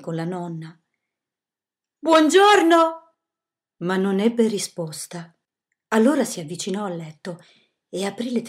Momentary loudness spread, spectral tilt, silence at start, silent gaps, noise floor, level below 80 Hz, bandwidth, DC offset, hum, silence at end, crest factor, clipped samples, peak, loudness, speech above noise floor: 21 LU; -4.5 dB/octave; 0 s; none; under -90 dBFS; -78 dBFS; 15.5 kHz; under 0.1%; none; 0 s; 20 dB; under 0.1%; -2 dBFS; -20 LUFS; over 70 dB